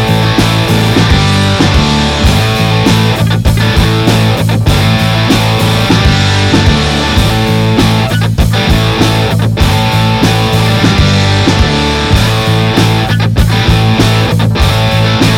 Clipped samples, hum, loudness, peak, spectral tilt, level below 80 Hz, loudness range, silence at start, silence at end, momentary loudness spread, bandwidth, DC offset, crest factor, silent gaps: under 0.1%; none; -9 LUFS; 0 dBFS; -5.5 dB/octave; -18 dBFS; 1 LU; 0 s; 0 s; 2 LU; 16.5 kHz; under 0.1%; 8 dB; none